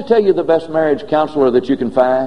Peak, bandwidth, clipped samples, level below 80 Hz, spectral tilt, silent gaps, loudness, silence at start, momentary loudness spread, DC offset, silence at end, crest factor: 0 dBFS; 9.4 kHz; under 0.1%; -50 dBFS; -7.5 dB/octave; none; -15 LUFS; 0 s; 3 LU; 1%; 0 s; 14 dB